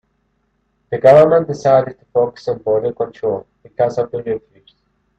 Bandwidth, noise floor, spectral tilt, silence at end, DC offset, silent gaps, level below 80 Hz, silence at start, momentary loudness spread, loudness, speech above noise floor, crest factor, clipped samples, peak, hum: 8.2 kHz; -65 dBFS; -7.5 dB/octave; 0.8 s; under 0.1%; none; -54 dBFS; 0.9 s; 16 LU; -16 LUFS; 50 dB; 16 dB; under 0.1%; 0 dBFS; none